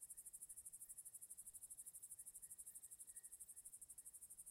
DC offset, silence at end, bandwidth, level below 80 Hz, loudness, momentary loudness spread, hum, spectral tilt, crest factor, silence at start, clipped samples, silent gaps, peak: under 0.1%; 0 s; 16 kHz; -86 dBFS; -56 LUFS; 2 LU; none; 0 dB/octave; 20 dB; 0 s; under 0.1%; none; -40 dBFS